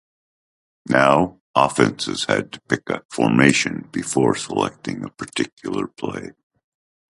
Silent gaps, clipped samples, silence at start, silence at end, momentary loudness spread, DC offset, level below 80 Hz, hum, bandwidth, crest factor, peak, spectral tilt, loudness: 1.41-1.54 s, 3.05-3.09 s, 5.52-5.57 s; under 0.1%; 0.85 s; 0.9 s; 14 LU; under 0.1%; -54 dBFS; none; 11.5 kHz; 22 dB; 0 dBFS; -4.5 dB/octave; -20 LUFS